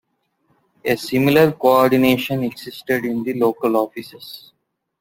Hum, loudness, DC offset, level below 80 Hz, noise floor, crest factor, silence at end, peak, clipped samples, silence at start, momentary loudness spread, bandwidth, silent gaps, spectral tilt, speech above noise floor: none; -18 LUFS; under 0.1%; -56 dBFS; -66 dBFS; 18 dB; 0.6 s; -2 dBFS; under 0.1%; 0.85 s; 20 LU; 17 kHz; none; -6 dB/octave; 48 dB